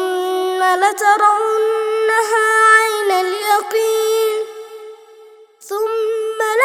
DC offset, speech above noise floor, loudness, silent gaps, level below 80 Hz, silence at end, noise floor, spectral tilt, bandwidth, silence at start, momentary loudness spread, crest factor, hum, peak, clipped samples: under 0.1%; 29 dB; -15 LUFS; none; -78 dBFS; 0 s; -43 dBFS; 0.5 dB/octave; 16.5 kHz; 0 s; 12 LU; 16 dB; none; 0 dBFS; under 0.1%